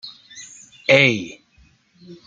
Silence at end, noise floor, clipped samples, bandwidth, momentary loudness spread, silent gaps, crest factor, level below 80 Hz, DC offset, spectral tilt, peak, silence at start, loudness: 0.1 s; -56 dBFS; under 0.1%; 9 kHz; 25 LU; none; 22 dB; -62 dBFS; under 0.1%; -4.5 dB/octave; 0 dBFS; 0.05 s; -16 LUFS